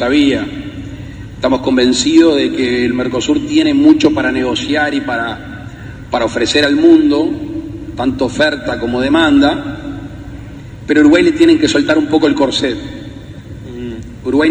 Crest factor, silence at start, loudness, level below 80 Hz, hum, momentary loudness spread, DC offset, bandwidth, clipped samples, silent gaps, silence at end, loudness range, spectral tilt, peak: 12 dB; 0 s; -12 LUFS; -36 dBFS; none; 20 LU; under 0.1%; 9.2 kHz; 0.1%; none; 0 s; 3 LU; -4.5 dB/octave; 0 dBFS